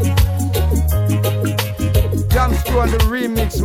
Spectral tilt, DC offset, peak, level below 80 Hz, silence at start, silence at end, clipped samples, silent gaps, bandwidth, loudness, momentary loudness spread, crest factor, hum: -6 dB/octave; under 0.1%; -2 dBFS; -20 dBFS; 0 s; 0 s; under 0.1%; none; 16.5 kHz; -17 LUFS; 3 LU; 12 dB; none